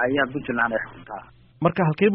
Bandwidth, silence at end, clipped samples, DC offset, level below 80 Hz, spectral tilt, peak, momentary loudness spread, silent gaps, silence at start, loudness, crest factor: 5.4 kHz; 0 s; under 0.1%; under 0.1%; -54 dBFS; -5 dB/octave; -6 dBFS; 17 LU; none; 0 s; -23 LUFS; 18 dB